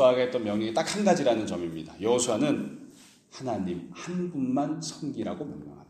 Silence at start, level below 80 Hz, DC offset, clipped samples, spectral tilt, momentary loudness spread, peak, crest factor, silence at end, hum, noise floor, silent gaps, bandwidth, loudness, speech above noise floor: 0 s; -66 dBFS; under 0.1%; under 0.1%; -5 dB/octave; 13 LU; -10 dBFS; 18 dB; 0.05 s; none; -52 dBFS; none; 14.5 kHz; -28 LUFS; 24 dB